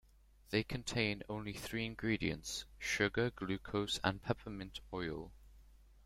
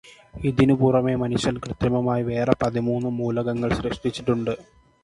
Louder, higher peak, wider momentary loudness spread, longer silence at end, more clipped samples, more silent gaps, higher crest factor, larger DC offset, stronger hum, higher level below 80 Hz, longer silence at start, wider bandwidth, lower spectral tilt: second, -39 LUFS vs -23 LUFS; second, -16 dBFS vs 0 dBFS; about the same, 9 LU vs 7 LU; second, 0.05 s vs 0.4 s; neither; neither; about the same, 24 dB vs 22 dB; neither; neither; second, -58 dBFS vs -44 dBFS; first, 0.5 s vs 0.05 s; first, 16.5 kHz vs 11.5 kHz; second, -4.5 dB/octave vs -7 dB/octave